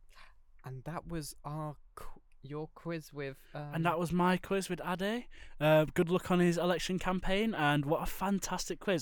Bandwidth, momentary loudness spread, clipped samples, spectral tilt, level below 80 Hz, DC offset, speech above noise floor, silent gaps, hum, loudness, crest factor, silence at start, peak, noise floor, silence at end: 19 kHz; 15 LU; under 0.1%; -5.5 dB/octave; -50 dBFS; under 0.1%; 23 dB; none; none; -33 LUFS; 20 dB; 0.1 s; -14 dBFS; -56 dBFS; 0 s